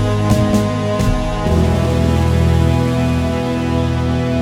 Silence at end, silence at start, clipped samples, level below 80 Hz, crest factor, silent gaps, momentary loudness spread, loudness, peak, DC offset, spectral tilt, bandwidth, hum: 0 s; 0 s; under 0.1%; -24 dBFS; 14 dB; none; 4 LU; -16 LUFS; -2 dBFS; under 0.1%; -7 dB/octave; 15 kHz; none